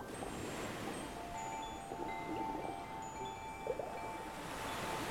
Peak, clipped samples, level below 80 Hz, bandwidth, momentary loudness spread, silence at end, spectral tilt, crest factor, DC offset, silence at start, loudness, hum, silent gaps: -26 dBFS; under 0.1%; -60 dBFS; 18 kHz; 4 LU; 0 s; -4 dB/octave; 16 dB; under 0.1%; 0 s; -43 LUFS; none; none